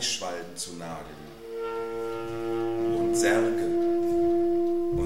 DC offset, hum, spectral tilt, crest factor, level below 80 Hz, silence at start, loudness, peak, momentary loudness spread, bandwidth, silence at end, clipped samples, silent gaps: 0.7%; none; -4 dB/octave; 16 dB; -54 dBFS; 0 s; -27 LUFS; -10 dBFS; 15 LU; 14.5 kHz; 0 s; under 0.1%; none